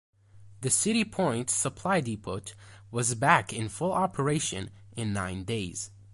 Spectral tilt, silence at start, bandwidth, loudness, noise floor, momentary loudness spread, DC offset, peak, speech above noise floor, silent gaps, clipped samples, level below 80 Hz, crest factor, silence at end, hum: -4 dB/octave; 0.35 s; 12 kHz; -29 LUFS; -51 dBFS; 13 LU; under 0.1%; -6 dBFS; 22 dB; none; under 0.1%; -56 dBFS; 24 dB; 0 s; none